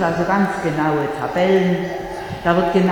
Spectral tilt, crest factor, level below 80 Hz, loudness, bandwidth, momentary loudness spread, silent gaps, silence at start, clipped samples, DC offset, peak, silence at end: -7 dB/octave; 16 dB; -44 dBFS; -19 LUFS; 18 kHz; 9 LU; none; 0 s; under 0.1%; under 0.1%; -2 dBFS; 0 s